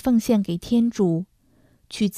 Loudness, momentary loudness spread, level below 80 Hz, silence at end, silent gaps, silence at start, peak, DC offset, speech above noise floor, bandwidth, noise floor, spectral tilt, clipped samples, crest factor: -22 LUFS; 14 LU; -52 dBFS; 0 s; none; 0.05 s; -8 dBFS; under 0.1%; 38 dB; 15 kHz; -59 dBFS; -6.5 dB/octave; under 0.1%; 14 dB